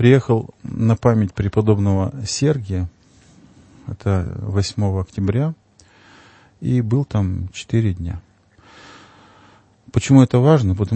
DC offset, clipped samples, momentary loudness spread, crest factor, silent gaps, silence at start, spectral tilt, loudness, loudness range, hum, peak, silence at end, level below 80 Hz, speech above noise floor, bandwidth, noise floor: under 0.1%; under 0.1%; 14 LU; 18 dB; none; 0 s; -7 dB/octave; -19 LUFS; 5 LU; none; 0 dBFS; 0 s; -42 dBFS; 34 dB; 8.8 kHz; -51 dBFS